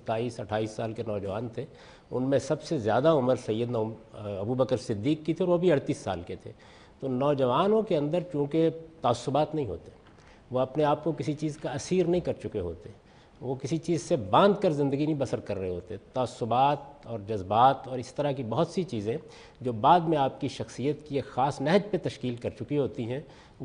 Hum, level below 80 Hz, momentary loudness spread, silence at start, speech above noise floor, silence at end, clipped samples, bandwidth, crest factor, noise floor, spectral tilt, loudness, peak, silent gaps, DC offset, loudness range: none; -58 dBFS; 13 LU; 0.05 s; 26 dB; 0 s; under 0.1%; 10.5 kHz; 20 dB; -54 dBFS; -6.5 dB/octave; -28 LUFS; -8 dBFS; none; under 0.1%; 3 LU